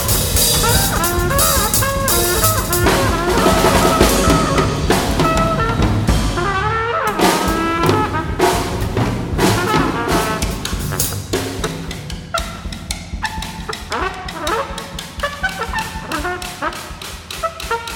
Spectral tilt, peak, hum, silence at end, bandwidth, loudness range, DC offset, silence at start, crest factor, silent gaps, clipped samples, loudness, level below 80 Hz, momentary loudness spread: -4 dB/octave; 0 dBFS; none; 0 s; 17.5 kHz; 9 LU; under 0.1%; 0 s; 16 dB; none; under 0.1%; -17 LUFS; -26 dBFS; 12 LU